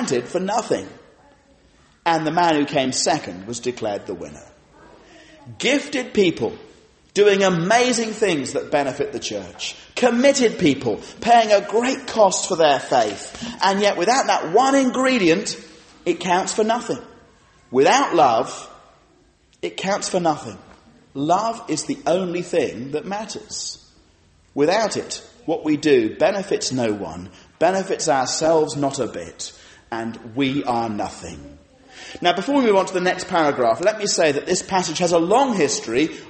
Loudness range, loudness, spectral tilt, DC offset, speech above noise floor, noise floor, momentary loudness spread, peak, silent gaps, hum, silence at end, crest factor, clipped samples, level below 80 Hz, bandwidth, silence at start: 6 LU; -20 LUFS; -3.5 dB/octave; under 0.1%; 37 dB; -57 dBFS; 13 LU; -2 dBFS; none; none; 0 s; 18 dB; under 0.1%; -56 dBFS; 8.8 kHz; 0 s